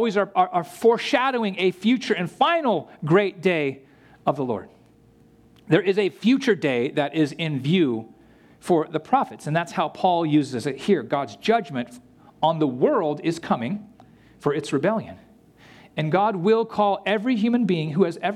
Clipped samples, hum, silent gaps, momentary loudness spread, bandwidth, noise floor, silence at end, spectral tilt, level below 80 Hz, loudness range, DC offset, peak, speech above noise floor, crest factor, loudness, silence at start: under 0.1%; none; none; 8 LU; 14 kHz; -54 dBFS; 0 s; -6.5 dB/octave; -66 dBFS; 3 LU; under 0.1%; -4 dBFS; 32 dB; 18 dB; -23 LUFS; 0 s